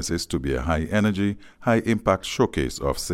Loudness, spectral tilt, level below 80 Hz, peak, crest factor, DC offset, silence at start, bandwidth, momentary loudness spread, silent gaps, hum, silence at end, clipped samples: -24 LUFS; -5.5 dB/octave; -38 dBFS; -6 dBFS; 18 dB; under 0.1%; 0 s; 16.5 kHz; 5 LU; none; none; 0 s; under 0.1%